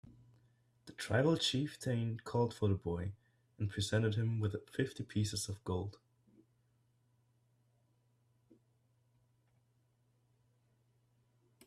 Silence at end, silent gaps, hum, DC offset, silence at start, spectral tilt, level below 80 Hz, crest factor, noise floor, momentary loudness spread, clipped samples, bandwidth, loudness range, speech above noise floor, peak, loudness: 5.75 s; none; none; under 0.1%; 0.05 s; -5.5 dB/octave; -70 dBFS; 20 dB; -75 dBFS; 9 LU; under 0.1%; 13.5 kHz; 9 LU; 39 dB; -20 dBFS; -37 LUFS